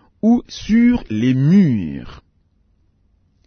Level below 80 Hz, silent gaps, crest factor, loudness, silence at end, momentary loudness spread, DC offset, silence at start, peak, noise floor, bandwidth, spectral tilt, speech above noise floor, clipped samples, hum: -42 dBFS; none; 14 dB; -16 LUFS; 1.3 s; 10 LU; under 0.1%; 0.25 s; -4 dBFS; -59 dBFS; 6.6 kHz; -8 dB/octave; 44 dB; under 0.1%; none